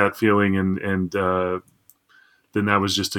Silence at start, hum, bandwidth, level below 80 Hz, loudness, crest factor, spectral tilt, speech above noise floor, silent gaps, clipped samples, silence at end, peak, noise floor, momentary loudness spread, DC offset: 0 s; none; 18 kHz; -64 dBFS; -22 LUFS; 22 dB; -5 dB/octave; 36 dB; none; under 0.1%; 0 s; 0 dBFS; -57 dBFS; 8 LU; under 0.1%